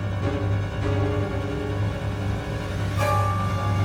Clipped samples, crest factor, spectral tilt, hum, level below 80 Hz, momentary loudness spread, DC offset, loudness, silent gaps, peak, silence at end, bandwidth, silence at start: under 0.1%; 14 dB; -7 dB/octave; none; -36 dBFS; 5 LU; 0.1%; -26 LUFS; none; -10 dBFS; 0 s; 13 kHz; 0 s